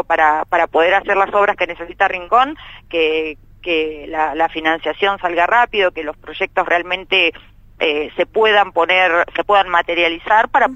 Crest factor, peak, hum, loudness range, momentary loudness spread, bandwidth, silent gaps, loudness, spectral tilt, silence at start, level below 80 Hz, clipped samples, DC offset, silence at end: 16 dB; 0 dBFS; none; 3 LU; 8 LU; 9 kHz; none; -16 LUFS; -4 dB/octave; 0.1 s; -46 dBFS; under 0.1%; under 0.1%; 0 s